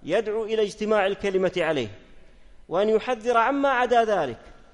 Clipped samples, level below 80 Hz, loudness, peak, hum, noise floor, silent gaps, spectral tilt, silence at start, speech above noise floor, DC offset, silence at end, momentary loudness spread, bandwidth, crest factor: under 0.1%; -52 dBFS; -24 LUFS; -8 dBFS; none; -47 dBFS; none; -5 dB/octave; 0 s; 24 dB; under 0.1%; 0.2 s; 8 LU; 11 kHz; 16 dB